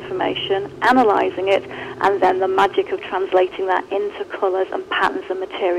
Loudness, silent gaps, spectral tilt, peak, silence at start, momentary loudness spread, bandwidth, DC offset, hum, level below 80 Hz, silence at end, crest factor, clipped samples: -19 LUFS; none; -5 dB/octave; -6 dBFS; 0 s; 8 LU; 10.5 kHz; under 0.1%; none; -56 dBFS; 0 s; 14 dB; under 0.1%